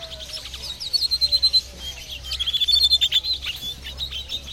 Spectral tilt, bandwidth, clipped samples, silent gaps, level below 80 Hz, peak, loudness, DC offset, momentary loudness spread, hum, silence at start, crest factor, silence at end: -0.5 dB/octave; 16.5 kHz; under 0.1%; none; -42 dBFS; -6 dBFS; -19 LUFS; under 0.1%; 17 LU; none; 0 s; 18 dB; 0 s